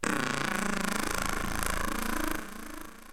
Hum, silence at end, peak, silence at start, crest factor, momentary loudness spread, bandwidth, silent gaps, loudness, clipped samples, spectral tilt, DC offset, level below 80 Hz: none; 0 s; -10 dBFS; 0 s; 22 dB; 12 LU; 17 kHz; none; -31 LUFS; under 0.1%; -3 dB/octave; 1%; -40 dBFS